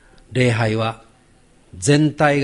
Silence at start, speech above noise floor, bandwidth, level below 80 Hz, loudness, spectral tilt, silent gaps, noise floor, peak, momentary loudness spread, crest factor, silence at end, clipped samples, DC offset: 0.3 s; 36 dB; 11.5 kHz; -48 dBFS; -18 LUFS; -5.5 dB/octave; none; -53 dBFS; -2 dBFS; 10 LU; 18 dB; 0 s; under 0.1%; under 0.1%